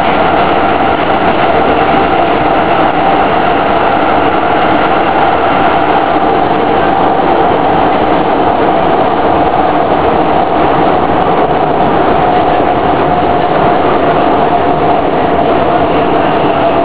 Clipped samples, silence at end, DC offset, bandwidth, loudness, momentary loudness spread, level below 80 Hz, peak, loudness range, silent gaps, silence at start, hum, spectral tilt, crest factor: 0.3%; 0 s; 8%; 4 kHz; -9 LUFS; 1 LU; -30 dBFS; 0 dBFS; 0 LU; none; 0 s; none; -9.5 dB/octave; 10 dB